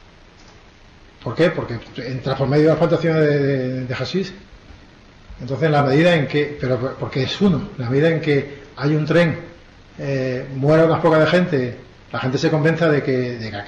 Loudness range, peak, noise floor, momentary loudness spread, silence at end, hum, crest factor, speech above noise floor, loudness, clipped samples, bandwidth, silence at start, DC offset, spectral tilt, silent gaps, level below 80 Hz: 3 LU; -6 dBFS; -46 dBFS; 14 LU; 0 s; none; 12 dB; 28 dB; -19 LUFS; under 0.1%; 9 kHz; 1.2 s; under 0.1%; -7.5 dB/octave; none; -48 dBFS